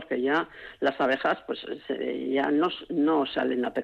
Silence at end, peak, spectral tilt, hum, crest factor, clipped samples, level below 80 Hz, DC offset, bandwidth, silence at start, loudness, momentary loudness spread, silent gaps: 0 s; -14 dBFS; -6.5 dB/octave; none; 12 dB; under 0.1%; -66 dBFS; under 0.1%; 6.8 kHz; 0 s; -27 LUFS; 9 LU; none